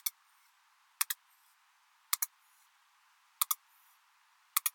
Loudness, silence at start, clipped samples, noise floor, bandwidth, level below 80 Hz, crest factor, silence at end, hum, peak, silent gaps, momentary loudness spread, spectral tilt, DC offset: -35 LUFS; 0.05 s; under 0.1%; -69 dBFS; 18 kHz; under -90 dBFS; 38 dB; 0.05 s; none; -4 dBFS; none; 5 LU; 9 dB/octave; under 0.1%